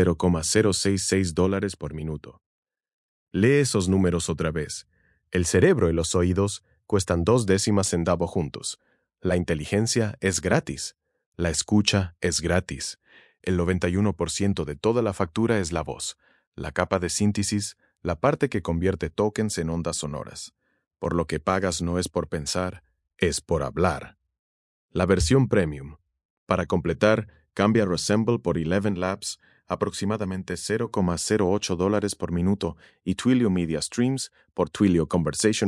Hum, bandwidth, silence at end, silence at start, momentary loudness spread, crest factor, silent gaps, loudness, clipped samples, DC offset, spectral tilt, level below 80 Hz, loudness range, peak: none; 12 kHz; 0 s; 0 s; 12 LU; 22 dB; 2.46-2.63 s, 2.93-3.27 s, 11.26-11.32 s, 16.47-16.52 s, 20.87-20.91 s, 24.39-24.89 s, 26.25-26.47 s; -25 LUFS; under 0.1%; under 0.1%; -5 dB/octave; -48 dBFS; 4 LU; -4 dBFS